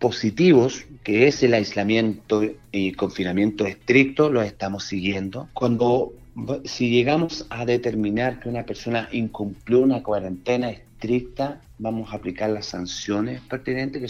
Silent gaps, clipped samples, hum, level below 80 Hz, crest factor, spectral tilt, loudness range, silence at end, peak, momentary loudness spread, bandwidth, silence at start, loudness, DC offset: none; under 0.1%; none; -50 dBFS; 18 dB; -6 dB/octave; 6 LU; 0 s; -4 dBFS; 12 LU; 7.4 kHz; 0 s; -23 LUFS; under 0.1%